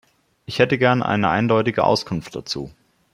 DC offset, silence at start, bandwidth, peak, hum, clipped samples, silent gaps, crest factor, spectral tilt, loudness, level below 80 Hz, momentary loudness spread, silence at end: under 0.1%; 0.5 s; 14.5 kHz; -2 dBFS; none; under 0.1%; none; 18 dB; -6 dB/octave; -20 LUFS; -54 dBFS; 12 LU; 0.45 s